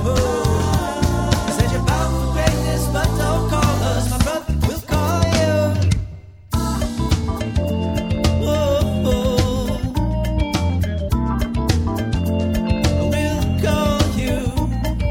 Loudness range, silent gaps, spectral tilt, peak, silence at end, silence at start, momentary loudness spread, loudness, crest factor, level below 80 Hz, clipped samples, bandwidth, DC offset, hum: 2 LU; none; -6 dB/octave; 0 dBFS; 0 s; 0 s; 4 LU; -19 LUFS; 18 dB; -24 dBFS; under 0.1%; 17 kHz; under 0.1%; none